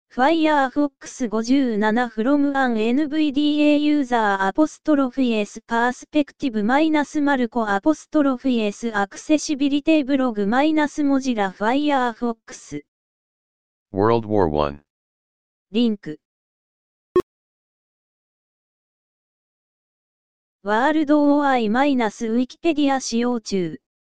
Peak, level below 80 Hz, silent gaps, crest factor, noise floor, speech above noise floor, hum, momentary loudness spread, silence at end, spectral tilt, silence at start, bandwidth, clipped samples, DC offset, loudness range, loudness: -2 dBFS; -52 dBFS; 12.88-13.86 s, 14.90-15.65 s, 16.25-17.15 s, 17.23-20.59 s; 18 dB; under -90 dBFS; over 70 dB; none; 8 LU; 0.15 s; -5 dB/octave; 0.05 s; 9.2 kHz; under 0.1%; 1%; 8 LU; -20 LUFS